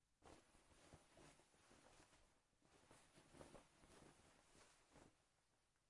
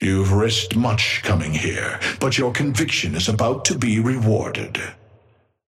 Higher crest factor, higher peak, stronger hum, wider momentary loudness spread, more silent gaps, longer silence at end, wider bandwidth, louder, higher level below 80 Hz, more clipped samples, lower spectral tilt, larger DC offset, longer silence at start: first, 26 dB vs 18 dB; second, -44 dBFS vs -4 dBFS; neither; about the same, 4 LU vs 5 LU; neither; second, 0 s vs 0.75 s; second, 12 kHz vs 15 kHz; second, -68 LUFS vs -20 LUFS; second, -82 dBFS vs -46 dBFS; neither; about the same, -3.5 dB/octave vs -4.5 dB/octave; neither; about the same, 0 s vs 0 s